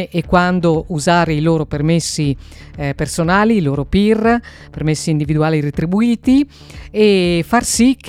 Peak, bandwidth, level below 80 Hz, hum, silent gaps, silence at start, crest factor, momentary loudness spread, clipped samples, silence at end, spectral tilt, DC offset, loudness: 0 dBFS; 15.5 kHz; -34 dBFS; none; none; 0 s; 14 dB; 8 LU; under 0.1%; 0 s; -5.5 dB/octave; under 0.1%; -15 LUFS